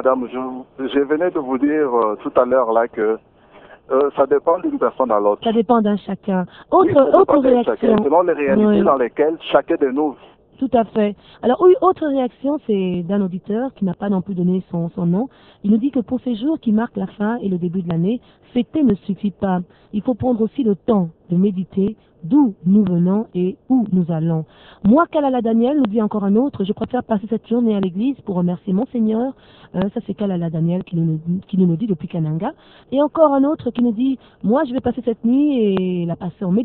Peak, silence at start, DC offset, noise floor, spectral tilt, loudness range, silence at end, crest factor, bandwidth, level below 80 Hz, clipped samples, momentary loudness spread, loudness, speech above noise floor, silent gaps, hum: 0 dBFS; 0 s; under 0.1%; -45 dBFS; -12 dB/octave; 5 LU; 0 s; 18 dB; 4.2 kHz; -52 dBFS; under 0.1%; 9 LU; -18 LUFS; 27 dB; none; none